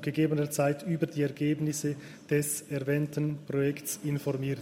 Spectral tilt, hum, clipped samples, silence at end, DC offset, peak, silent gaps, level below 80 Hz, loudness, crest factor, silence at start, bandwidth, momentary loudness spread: -6 dB/octave; none; under 0.1%; 0 s; under 0.1%; -16 dBFS; none; -68 dBFS; -31 LUFS; 14 dB; 0 s; 16 kHz; 5 LU